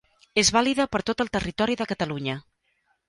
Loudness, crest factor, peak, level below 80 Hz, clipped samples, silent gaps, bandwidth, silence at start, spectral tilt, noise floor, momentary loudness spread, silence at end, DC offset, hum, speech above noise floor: -24 LUFS; 20 dB; -6 dBFS; -50 dBFS; under 0.1%; none; 11.5 kHz; 0.35 s; -3 dB/octave; -71 dBFS; 10 LU; 0.7 s; under 0.1%; none; 46 dB